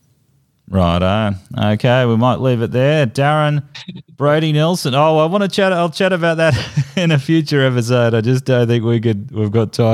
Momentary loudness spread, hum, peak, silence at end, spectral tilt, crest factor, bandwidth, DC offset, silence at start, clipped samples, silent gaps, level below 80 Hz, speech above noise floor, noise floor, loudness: 6 LU; none; -2 dBFS; 0 s; -6.5 dB/octave; 14 dB; 13.5 kHz; under 0.1%; 0.7 s; under 0.1%; none; -48 dBFS; 44 dB; -58 dBFS; -15 LUFS